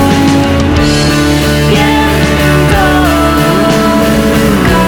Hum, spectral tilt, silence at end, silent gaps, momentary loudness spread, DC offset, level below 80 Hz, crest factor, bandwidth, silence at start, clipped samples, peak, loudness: none; -5.5 dB/octave; 0 s; none; 1 LU; under 0.1%; -18 dBFS; 8 dB; 19.5 kHz; 0 s; under 0.1%; 0 dBFS; -8 LUFS